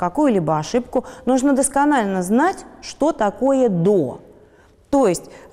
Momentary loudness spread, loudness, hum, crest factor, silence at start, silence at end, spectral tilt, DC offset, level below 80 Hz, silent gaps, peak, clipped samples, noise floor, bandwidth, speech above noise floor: 9 LU; -19 LUFS; none; 12 dB; 0 s; 0.15 s; -5.5 dB/octave; under 0.1%; -50 dBFS; none; -8 dBFS; under 0.1%; -51 dBFS; 15.5 kHz; 32 dB